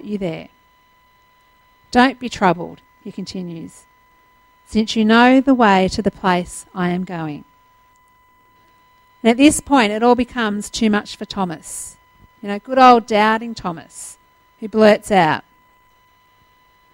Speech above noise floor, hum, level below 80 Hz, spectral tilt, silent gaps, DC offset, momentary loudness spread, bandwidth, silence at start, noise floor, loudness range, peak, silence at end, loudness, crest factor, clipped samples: 39 dB; none; -48 dBFS; -5 dB/octave; none; under 0.1%; 21 LU; 16.5 kHz; 0.05 s; -55 dBFS; 6 LU; 0 dBFS; 1.55 s; -16 LUFS; 18 dB; under 0.1%